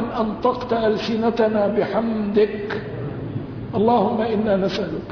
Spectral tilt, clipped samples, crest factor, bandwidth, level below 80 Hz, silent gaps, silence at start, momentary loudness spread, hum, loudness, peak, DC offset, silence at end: -7.5 dB/octave; under 0.1%; 14 dB; 5.4 kHz; -46 dBFS; none; 0 s; 10 LU; none; -21 LUFS; -6 dBFS; under 0.1%; 0 s